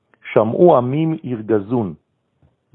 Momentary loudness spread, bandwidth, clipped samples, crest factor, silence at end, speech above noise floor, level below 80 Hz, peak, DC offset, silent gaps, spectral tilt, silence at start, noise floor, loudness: 10 LU; 3.9 kHz; under 0.1%; 18 dB; 0.8 s; 44 dB; -60 dBFS; 0 dBFS; under 0.1%; none; -11.5 dB/octave; 0.25 s; -60 dBFS; -17 LUFS